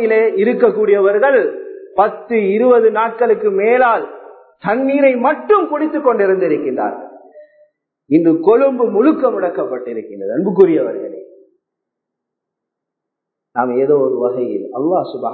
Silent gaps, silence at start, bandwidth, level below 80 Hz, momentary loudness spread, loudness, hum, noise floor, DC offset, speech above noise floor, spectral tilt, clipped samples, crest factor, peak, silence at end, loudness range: none; 0 s; 4.5 kHz; -64 dBFS; 11 LU; -14 LUFS; none; -80 dBFS; under 0.1%; 66 dB; -10.5 dB/octave; under 0.1%; 14 dB; 0 dBFS; 0 s; 6 LU